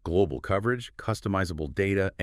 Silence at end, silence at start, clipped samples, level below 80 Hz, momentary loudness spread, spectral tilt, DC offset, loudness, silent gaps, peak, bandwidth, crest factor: 0 s; 0.05 s; under 0.1%; -48 dBFS; 5 LU; -6.5 dB/octave; under 0.1%; -28 LUFS; none; -12 dBFS; 14.5 kHz; 16 dB